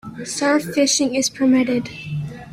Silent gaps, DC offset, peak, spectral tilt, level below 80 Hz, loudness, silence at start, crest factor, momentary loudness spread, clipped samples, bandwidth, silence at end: none; under 0.1%; -4 dBFS; -3.5 dB/octave; -54 dBFS; -19 LUFS; 0.05 s; 16 dB; 12 LU; under 0.1%; 15.5 kHz; 0 s